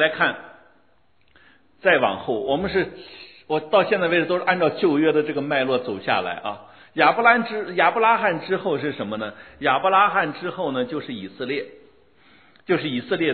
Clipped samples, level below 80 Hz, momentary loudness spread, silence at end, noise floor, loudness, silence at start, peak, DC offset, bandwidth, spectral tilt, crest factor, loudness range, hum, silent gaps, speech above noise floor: under 0.1%; -60 dBFS; 14 LU; 0 s; -63 dBFS; -21 LUFS; 0 s; -2 dBFS; 0.1%; 4.5 kHz; -9 dB/octave; 20 dB; 4 LU; none; none; 42 dB